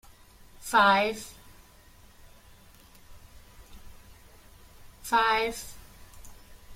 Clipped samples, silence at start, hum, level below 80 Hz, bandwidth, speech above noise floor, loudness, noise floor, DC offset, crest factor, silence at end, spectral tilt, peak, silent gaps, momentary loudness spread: under 0.1%; 0.6 s; none; -54 dBFS; 16.5 kHz; 30 dB; -25 LUFS; -54 dBFS; under 0.1%; 24 dB; 0 s; -2.5 dB/octave; -8 dBFS; none; 24 LU